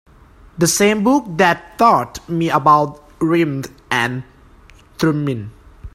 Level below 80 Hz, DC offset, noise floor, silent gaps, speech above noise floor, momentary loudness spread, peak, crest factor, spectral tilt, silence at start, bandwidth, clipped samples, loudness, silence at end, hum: -46 dBFS; under 0.1%; -45 dBFS; none; 30 dB; 11 LU; 0 dBFS; 18 dB; -4.5 dB/octave; 0.55 s; 16 kHz; under 0.1%; -16 LUFS; 0.05 s; none